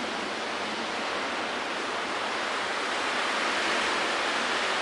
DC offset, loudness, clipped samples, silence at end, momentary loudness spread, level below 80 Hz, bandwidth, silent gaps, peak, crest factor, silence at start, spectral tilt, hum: under 0.1%; -28 LUFS; under 0.1%; 0 s; 5 LU; -68 dBFS; 11.5 kHz; none; -14 dBFS; 16 dB; 0 s; -1.5 dB/octave; none